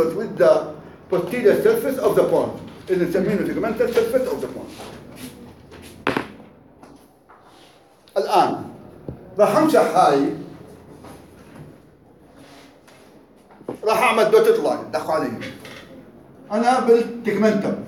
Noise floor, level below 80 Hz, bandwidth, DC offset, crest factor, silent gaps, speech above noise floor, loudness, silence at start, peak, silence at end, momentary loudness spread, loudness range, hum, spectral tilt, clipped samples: -51 dBFS; -56 dBFS; 17 kHz; under 0.1%; 18 dB; none; 33 dB; -19 LUFS; 0 s; -2 dBFS; 0 s; 22 LU; 11 LU; none; -5.5 dB/octave; under 0.1%